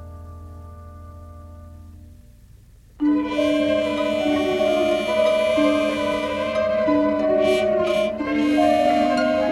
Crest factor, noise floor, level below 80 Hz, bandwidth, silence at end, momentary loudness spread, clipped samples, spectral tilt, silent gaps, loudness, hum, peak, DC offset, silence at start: 14 dB; -48 dBFS; -46 dBFS; 12.5 kHz; 0 s; 22 LU; under 0.1%; -5.5 dB/octave; none; -20 LUFS; none; -8 dBFS; under 0.1%; 0 s